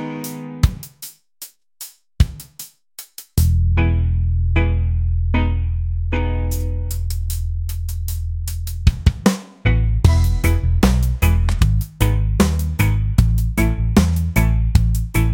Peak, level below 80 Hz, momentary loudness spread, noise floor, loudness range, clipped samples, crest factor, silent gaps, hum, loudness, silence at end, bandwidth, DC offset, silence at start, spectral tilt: 0 dBFS; -22 dBFS; 18 LU; -41 dBFS; 6 LU; under 0.1%; 18 dB; none; none; -19 LUFS; 0 s; 17 kHz; 0.1%; 0 s; -6 dB/octave